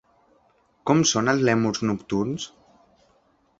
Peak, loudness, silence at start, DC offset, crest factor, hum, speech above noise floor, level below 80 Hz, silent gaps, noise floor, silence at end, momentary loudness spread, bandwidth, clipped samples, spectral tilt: -4 dBFS; -23 LUFS; 0.85 s; under 0.1%; 22 dB; none; 41 dB; -58 dBFS; none; -63 dBFS; 1.15 s; 13 LU; 8.2 kHz; under 0.1%; -4.5 dB/octave